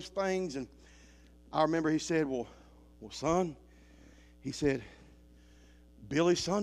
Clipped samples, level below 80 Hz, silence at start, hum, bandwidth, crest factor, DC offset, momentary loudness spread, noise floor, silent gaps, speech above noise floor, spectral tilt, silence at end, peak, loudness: under 0.1%; -58 dBFS; 0 s; none; 12.5 kHz; 20 dB; under 0.1%; 18 LU; -58 dBFS; none; 26 dB; -5 dB/octave; 0 s; -14 dBFS; -33 LUFS